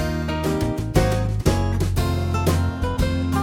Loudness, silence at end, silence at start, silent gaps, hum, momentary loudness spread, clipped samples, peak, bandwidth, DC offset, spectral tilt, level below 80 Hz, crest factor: -22 LUFS; 0 s; 0 s; none; none; 3 LU; under 0.1%; -4 dBFS; 18 kHz; under 0.1%; -6.5 dB/octave; -28 dBFS; 18 dB